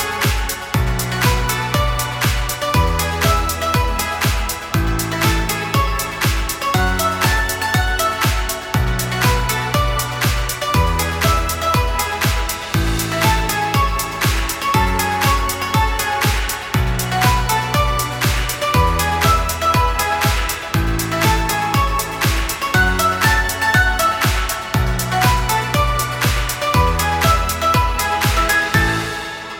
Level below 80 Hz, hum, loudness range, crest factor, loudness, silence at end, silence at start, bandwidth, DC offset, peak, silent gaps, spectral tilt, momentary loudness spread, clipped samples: -24 dBFS; none; 2 LU; 16 dB; -17 LUFS; 0 s; 0 s; 19 kHz; under 0.1%; 0 dBFS; none; -4 dB/octave; 4 LU; under 0.1%